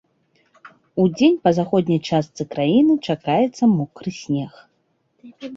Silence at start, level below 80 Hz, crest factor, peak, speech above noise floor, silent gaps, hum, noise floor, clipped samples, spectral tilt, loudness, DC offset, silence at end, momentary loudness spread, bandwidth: 0.95 s; -60 dBFS; 18 dB; -2 dBFS; 48 dB; none; none; -67 dBFS; under 0.1%; -7 dB/octave; -19 LUFS; under 0.1%; 0 s; 13 LU; 7.8 kHz